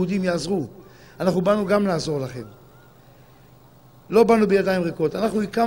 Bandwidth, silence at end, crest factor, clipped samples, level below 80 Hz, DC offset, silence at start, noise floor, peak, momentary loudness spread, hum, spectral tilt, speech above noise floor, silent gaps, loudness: 16 kHz; 0 s; 18 dB; under 0.1%; -52 dBFS; 0.1%; 0 s; -50 dBFS; -4 dBFS; 13 LU; none; -6.5 dB/octave; 30 dB; none; -21 LUFS